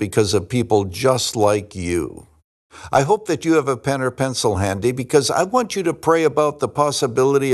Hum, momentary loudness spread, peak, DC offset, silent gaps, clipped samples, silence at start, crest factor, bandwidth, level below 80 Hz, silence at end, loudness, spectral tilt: none; 5 LU; -2 dBFS; under 0.1%; 2.44-2.70 s; under 0.1%; 0 s; 18 dB; 12.5 kHz; -52 dBFS; 0 s; -19 LUFS; -5 dB/octave